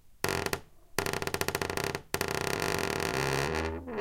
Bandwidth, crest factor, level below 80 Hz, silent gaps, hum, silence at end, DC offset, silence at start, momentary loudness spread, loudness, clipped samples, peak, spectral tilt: 17 kHz; 26 dB; -50 dBFS; none; none; 0 s; under 0.1%; 0.05 s; 5 LU; -32 LUFS; under 0.1%; -6 dBFS; -3.5 dB/octave